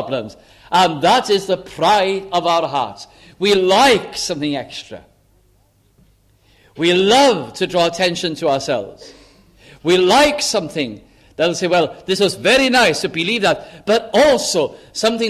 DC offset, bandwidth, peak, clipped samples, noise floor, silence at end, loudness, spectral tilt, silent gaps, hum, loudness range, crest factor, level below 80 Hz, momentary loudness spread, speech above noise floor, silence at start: under 0.1%; 15.5 kHz; -2 dBFS; under 0.1%; -56 dBFS; 0 s; -16 LUFS; -3.5 dB/octave; none; none; 3 LU; 16 dB; -50 dBFS; 12 LU; 40 dB; 0 s